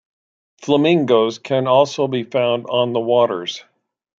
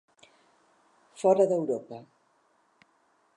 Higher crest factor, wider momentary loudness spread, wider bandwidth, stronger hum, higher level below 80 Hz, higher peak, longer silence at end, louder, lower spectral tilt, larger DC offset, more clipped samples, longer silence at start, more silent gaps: about the same, 16 dB vs 20 dB; second, 10 LU vs 23 LU; second, 7.6 kHz vs 11 kHz; neither; first, -68 dBFS vs -86 dBFS; first, -2 dBFS vs -10 dBFS; second, 0.6 s vs 1.35 s; first, -17 LUFS vs -26 LUFS; about the same, -6 dB/octave vs -7 dB/octave; neither; neither; second, 0.6 s vs 1.2 s; neither